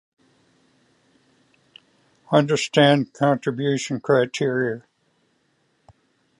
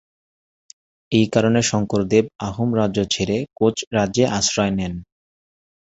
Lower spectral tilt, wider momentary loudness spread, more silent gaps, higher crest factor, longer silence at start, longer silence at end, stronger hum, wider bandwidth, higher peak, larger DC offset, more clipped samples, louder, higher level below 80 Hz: about the same, -5.5 dB/octave vs -5 dB/octave; about the same, 8 LU vs 7 LU; second, none vs 3.87-3.91 s; about the same, 22 dB vs 18 dB; first, 2.3 s vs 1.1 s; first, 1.6 s vs 0.85 s; neither; first, 11.5 kHz vs 8.2 kHz; about the same, -2 dBFS vs -2 dBFS; neither; neither; about the same, -21 LUFS vs -20 LUFS; second, -68 dBFS vs -46 dBFS